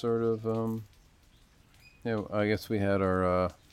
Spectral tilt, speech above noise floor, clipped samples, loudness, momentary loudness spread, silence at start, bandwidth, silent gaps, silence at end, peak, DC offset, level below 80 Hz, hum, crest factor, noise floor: -7.5 dB/octave; 31 dB; under 0.1%; -30 LUFS; 8 LU; 0 s; 16.5 kHz; none; 0.2 s; -14 dBFS; under 0.1%; -60 dBFS; none; 16 dB; -61 dBFS